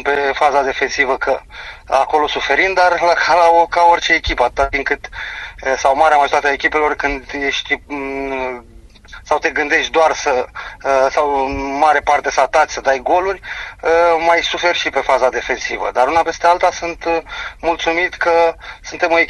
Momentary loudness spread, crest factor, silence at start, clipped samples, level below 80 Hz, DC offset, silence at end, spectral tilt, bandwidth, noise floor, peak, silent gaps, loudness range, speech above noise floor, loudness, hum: 10 LU; 16 dB; 0 s; under 0.1%; -38 dBFS; under 0.1%; 0 s; -2.5 dB/octave; 11.5 kHz; -38 dBFS; 0 dBFS; none; 4 LU; 23 dB; -15 LUFS; none